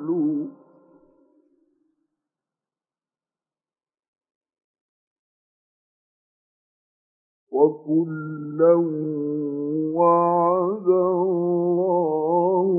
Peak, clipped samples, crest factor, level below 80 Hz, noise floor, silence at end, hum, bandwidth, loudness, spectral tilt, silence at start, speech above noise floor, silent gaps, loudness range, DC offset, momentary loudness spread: -6 dBFS; under 0.1%; 18 dB; -88 dBFS; under -90 dBFS; 0 s; none; 2.6 kHz; -22 LUFS; -15.5 dB/octave; 0 s; over 70 dB; 4.08-4.13 s, 4.35-4.41 s, 4.64-4.74 s, 4.81-7.47 s; 9 LU; under 0.1%; 10 LU